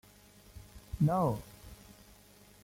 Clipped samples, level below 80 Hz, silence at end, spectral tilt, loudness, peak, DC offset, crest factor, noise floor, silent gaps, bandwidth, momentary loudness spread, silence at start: under 0.1%; -54 dBFS; 0.9 s; -8 dB/octave; -32 LUFS; -18 dBFS; under 0.1%; 18 dB; -59 dBFS; none; 16.5 kHz; 26 LU; 0.55 s